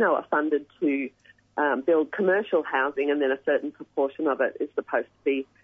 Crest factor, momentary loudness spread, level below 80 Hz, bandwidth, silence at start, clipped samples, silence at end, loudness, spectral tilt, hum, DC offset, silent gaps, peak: 16 dB; 7 LU; -76 dBFS; 3.8 kHz; 0 s; under 0.1%; 0.2 s; -26 LUFS; -7.5 dB/octave; none; under 0.1%; none; -10 dBFS